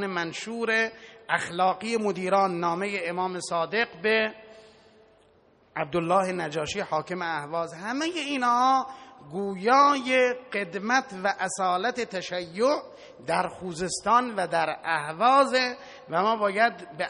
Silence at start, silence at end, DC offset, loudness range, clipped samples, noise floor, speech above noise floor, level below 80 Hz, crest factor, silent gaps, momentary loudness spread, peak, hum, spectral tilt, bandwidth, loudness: 0 s; 0 s; under 0.1%; 5 LU; under 0.1%; -60 dBFS; 34 dB; -66 dBFS; 20 dB; none; 11 LU; -8 dBFS; none; -4 dB/octave; 10.5 kHz; -26 LUFS